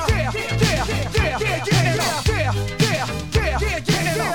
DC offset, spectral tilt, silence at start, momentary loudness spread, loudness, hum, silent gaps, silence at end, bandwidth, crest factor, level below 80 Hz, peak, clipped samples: 0.8%; -4.5 dB/octave; 0 s; 4 LU; -20 LUFS; none; none; 0 s; 19.5 kHz; 16 dB; -30 dBFS; -4 dBFS; under 0.1%